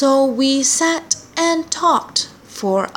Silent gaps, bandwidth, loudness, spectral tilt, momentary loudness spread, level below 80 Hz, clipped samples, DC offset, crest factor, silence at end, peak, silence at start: none; 17 kHz; -17 LUFS; -2 dB/octave; 7 LU; -60 dBFS; under 0.1%; under 0.1%; 16 dB; 0.05 s; 0 dBFS; 0 s